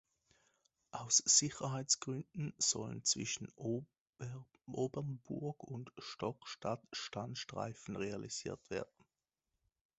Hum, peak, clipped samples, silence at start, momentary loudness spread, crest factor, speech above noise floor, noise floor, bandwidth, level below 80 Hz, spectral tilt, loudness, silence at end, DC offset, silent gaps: none; -16 dBFS; under 0.1%; 0.95 s; 17 LU; 24 dB; over 50 dB; under -90 dBFS; 8.2 kHz; -72 dBFS; -2.5 dB/octave; -38 LUFS; 1.15 s; under 0.1%; 4.01-4.13 s